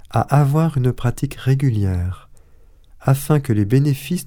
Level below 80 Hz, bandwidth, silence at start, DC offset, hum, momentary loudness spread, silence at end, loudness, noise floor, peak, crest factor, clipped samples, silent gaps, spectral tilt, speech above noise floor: -38 dBFS; 18 kHz; 0.05 s; under 0.1%; none; 8 LU; 0 s; -18 LUFS; -47 dBFS; 0 dBFS; 18 dB; under 0.1%; none; -7.5 dB/octave; 29 dB